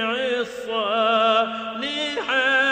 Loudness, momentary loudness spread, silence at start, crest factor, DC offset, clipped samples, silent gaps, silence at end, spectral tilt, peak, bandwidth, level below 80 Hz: -21 LUFS; 9 LU; 0 s; 16 dB; under 0.1%; under 0.1%; none; 0 s; -2.5 dB/octave; -6 dBFS; 14.5 kHz; -64 dBFS